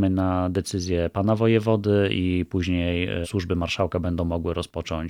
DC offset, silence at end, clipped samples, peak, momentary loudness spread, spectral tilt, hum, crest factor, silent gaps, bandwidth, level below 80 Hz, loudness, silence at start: under 0.1%; 0 s; under 0.1%; -8 dBFS; 7 LU; -6.5 dB/octave; none; 16 dB; none; 14 kHz; -42 dBFS; -24 LUFS; 0 s